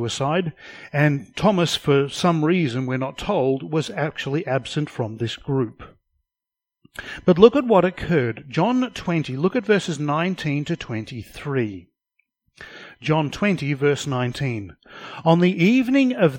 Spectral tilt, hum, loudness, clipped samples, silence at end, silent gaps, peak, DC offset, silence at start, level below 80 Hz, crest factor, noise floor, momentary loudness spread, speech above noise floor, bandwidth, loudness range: -6.5 dB/octave; none; -21 LUFS; under 0.1%; 0 s; none; 0 dBFS; under 0.1%; 0 s; -52 dBFS; 22 dB; -88 dBFS; 14 LU; 67 dB; 16.5 kHz; 7 LU